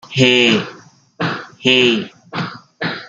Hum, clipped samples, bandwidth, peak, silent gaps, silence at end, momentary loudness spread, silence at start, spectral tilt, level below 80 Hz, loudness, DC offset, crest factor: none; under 0.1%; 9 kHz; -2 dBFS; none; 0 s; 15 LU; 0.05 s; -4.5 dB/octave; -60 dBFS; -15 LUFS; under 0.1%; 16 dB